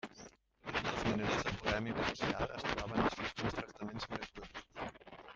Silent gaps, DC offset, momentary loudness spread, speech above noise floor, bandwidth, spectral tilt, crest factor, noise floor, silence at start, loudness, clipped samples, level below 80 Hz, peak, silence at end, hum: none; under 0.1%; 15 LU; 21 dB; 9.2 kHz; -5 dB/octave; 24 dB; -58 dBFS; 0.05 s; -38 LUFS; under 0.1%; -56 dBFS; -16 dBFS; 0 s; none